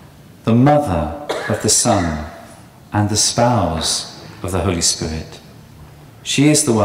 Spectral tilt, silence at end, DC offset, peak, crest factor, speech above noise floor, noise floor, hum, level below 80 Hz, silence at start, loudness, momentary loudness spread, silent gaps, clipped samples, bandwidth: -4 dB/octave; 0 s; under 0.1%; -2 dBFS; 14 dB; 25 dB; -40 dBFS; none; -38 dBFS; 0 s; -16 LUFS; 16 LU; none; under 0.1%; 16 kHz